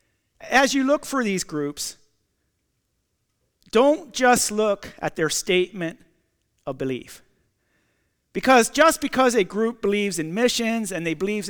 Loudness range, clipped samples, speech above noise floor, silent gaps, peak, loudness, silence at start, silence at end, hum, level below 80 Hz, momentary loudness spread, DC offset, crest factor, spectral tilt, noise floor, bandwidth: 7 LU; under 0.1%; 52 dB; none; -6 dBFS; -21 LUFS; 0.4 s; 0 s; none; -56 dBFS; 13 LU; under 0.1%; 18 dB; -3.5 dB/octave; -73 dBFS; over 20 kHz